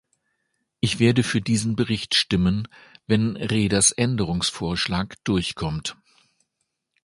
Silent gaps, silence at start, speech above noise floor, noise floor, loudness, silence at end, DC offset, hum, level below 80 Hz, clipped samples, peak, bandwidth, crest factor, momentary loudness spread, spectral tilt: none; 0.85 s; 55 dB; -77 dBFS; -22 LUFS; 1.1 s; under 0.1%; none; -44 dBFS; under 0.1%; -4 dBFS; 11.5 kHz; 20 dB; 10 LU; -4 dB/octave